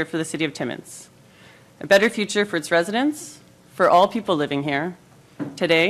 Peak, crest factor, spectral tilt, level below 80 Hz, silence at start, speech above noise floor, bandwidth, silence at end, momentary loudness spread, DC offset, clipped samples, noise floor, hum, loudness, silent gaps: -4 dBFS; 18 dB; -4 dB/octave; -64 dBFS; 0 s; 28 dB; 15 kHz; 0 s; 18 LU; under 0.1%; under 0.1%; -49 dBFS; none; -21 LUFS; none